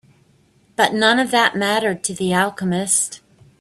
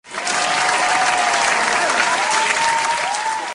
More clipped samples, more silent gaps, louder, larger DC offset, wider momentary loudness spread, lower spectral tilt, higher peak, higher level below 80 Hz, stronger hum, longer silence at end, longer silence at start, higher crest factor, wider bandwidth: neither; neither; about the same, -18 LUFS vs -16 LUFS; neither; first, 8 LU vs 4 LU; first, -3 dB/octave vs 0 dB/octave; about the same, 0 dBFS vs -2 dBFS; about the same, -60 dBFS vs -58 dBFS; neither; first, 0.45 s vs 0 s; first, 0.8 s vs 0.05 s; about the same, 20 dB vs 16 dB; first, 14.5 kHz vs 11 kHz